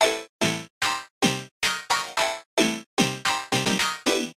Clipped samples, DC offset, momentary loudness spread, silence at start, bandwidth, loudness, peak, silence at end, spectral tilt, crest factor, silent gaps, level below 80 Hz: under 0.1%; under 0.1%; 3 LU; 0 s; 16 kHz; -24 LUFS; -2 dBFS; 0.05 s; -2.5 dB/octave; 22 dB; 0.29-0.39 s, 0.70-0.81 s, 1.10-1.21 s, 1.51-1.61 s, 2.46-2.57 s, 2.86-2.97 s; -60 dBFS